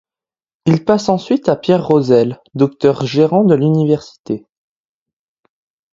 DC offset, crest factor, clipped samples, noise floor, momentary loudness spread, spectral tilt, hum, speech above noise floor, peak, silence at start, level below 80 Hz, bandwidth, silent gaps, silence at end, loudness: under 0.1%; 16 dB; under 0.1%; under -90 dBFS; 9 LU; -7.5 dB/octave; none; over 77 dB; 0 dBFS; 0.65 s; -54 dBFS; 7.6 kHz; 4.20-4.24 s; 1.55 s; -14 LUFS